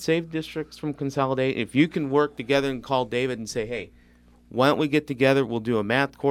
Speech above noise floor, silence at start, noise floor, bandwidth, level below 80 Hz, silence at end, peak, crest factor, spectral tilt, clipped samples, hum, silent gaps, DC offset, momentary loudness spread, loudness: 31 dB; 0 s; -55 dBFS; 15.5 kHz; -56 dBFS; 0 s; -4 dBFS; 20 dB; -6 dB/octave; under 0.1%; none; none; under 0.1%; 11 LU; -25 LUFS